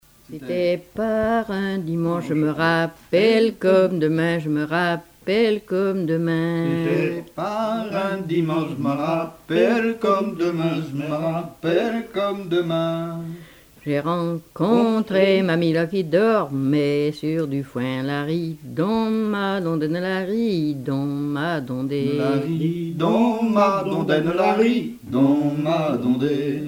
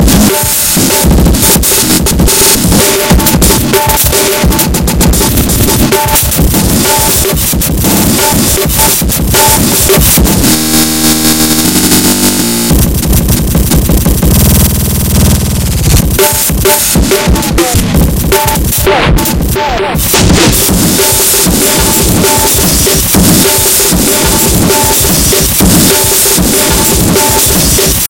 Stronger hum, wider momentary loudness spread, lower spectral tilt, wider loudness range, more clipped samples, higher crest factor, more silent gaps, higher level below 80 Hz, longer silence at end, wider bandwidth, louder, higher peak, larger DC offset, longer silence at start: neither; first, 8 LU vs 4 LU; first, -7.5 dB/octave vs -3.5 dB/octave; about the same, 4 LU vs 2 LU; second, under 0.1% vs 1%; first, 16 dB vs 6 dB; neither; second, -56 dBFS vs -16 dBFS; about the same, 0 s vs 0 s; second, 16.5 kHz vs over 20 kHz; second, -22 LUFS vs -6 LUFS; second, -4 dBFS vs 0 dBFS; neither; first, 0.3 s vs 0 s